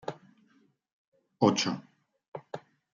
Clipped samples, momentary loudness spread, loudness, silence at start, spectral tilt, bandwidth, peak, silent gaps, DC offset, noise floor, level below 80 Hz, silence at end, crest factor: under 0.1%; 22 LU; -28 LUFS; 0.05 s; -4.5 dB/octave; 7.6 kHz; -10 dBFS; 0.93-1.12 s, 2.28-2.32 s; under 0.1%; -67 dBFS; -78 dBFS; 0.35 s; 24 dB